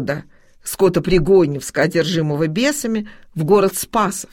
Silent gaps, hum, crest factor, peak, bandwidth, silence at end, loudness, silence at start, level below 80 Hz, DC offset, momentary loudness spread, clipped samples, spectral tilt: none; none; 16 dB; -2 dBFS; 16.5 kHz; 0.05 s; -17 LUFS; 0 s; -38 dBFS; under 0.1%; 11 LU; under 0.1%; -5 dB/octave